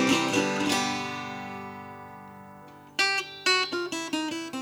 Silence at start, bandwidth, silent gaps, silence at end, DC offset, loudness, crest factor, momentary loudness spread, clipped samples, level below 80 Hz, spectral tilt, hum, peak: 0 s; over 20 kHz; none; 0 s; under 0.1%; -27 LUFS; 20 dB; 21 LU; under 0.1%; -70 dBFS; -2.5 dB/octave; none; -10 dBFS